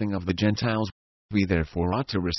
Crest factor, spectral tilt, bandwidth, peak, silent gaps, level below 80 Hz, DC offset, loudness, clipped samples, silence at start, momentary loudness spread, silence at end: 18 dB; -6.5 dB/octave; 6.2 kHz; -8 dBFS; 0.92-1.29 s; -40 dBFS; under 0.1%; -26 LUFS; under 0.1%; 0 s; 5 LU; 0 s